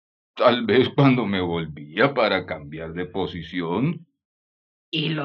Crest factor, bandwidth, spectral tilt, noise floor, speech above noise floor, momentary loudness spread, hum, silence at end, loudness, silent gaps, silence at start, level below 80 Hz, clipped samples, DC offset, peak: 20 dB; 6.2 kHz; -8.5 dB/octave; under -90 dBFS; over 68 dB; 13 LU; none; 0 s; -22 LUFS; 4.25-4.92 s; 0.35 s; -58 dBFS; under 0.1%; under 0.1%; -4 dBFS